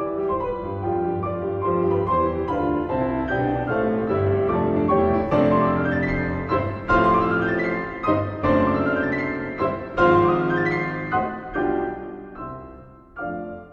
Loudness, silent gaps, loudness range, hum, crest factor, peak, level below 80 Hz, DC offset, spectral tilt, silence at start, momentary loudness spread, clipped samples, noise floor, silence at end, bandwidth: -22 LUFS; none; 3 LU; none; 18 dB; -4 dBFS; -42 dBFS; under 0.1%; -9 dB/octave; 0 s; 12 LU; under 0.1%; -44 dBFS; 0 s; 7 kHz